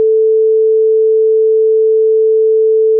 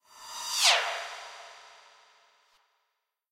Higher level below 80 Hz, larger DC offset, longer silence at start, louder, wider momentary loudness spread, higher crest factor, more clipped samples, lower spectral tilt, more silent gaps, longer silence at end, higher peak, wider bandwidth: second, under -90 dBFS vs -82 dBFS; neither; second, 0 s vs 0.15 s; first, -10 LUFS vs -25 LUFS; second, 0 LU vs 24 LU; second, 4 dB vs 24 dB; neither; first, -10.5 dB/octave vs 4.5 dB/octave; neither; second, 0 s vs 1.55 s; first, -6 dBFS vs -10 dBFS; second, 0.5 kHz vs 16 kHz